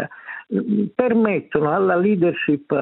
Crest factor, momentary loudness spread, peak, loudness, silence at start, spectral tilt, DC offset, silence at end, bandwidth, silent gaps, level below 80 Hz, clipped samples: 16 dB; 8 LU; -2 dBFS; -19 LUFS; 0 s; -11.5 dB/octave; under 0.1%; 0 s; 4.1 kHz; none; -62 dBFS; under 0.1%